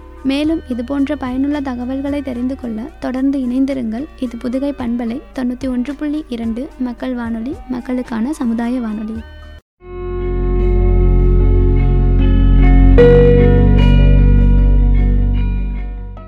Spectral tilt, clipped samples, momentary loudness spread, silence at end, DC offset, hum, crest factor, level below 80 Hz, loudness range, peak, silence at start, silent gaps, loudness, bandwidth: -9 dB/octave; under 0.1%; 13 LU; 0 s; under 0.1%; none; 12 dB; -16 dBFS; 10 LU; 0 dBFS; 0 s; 9.62-9.77 s; -16 LUFS; 5.4 kHz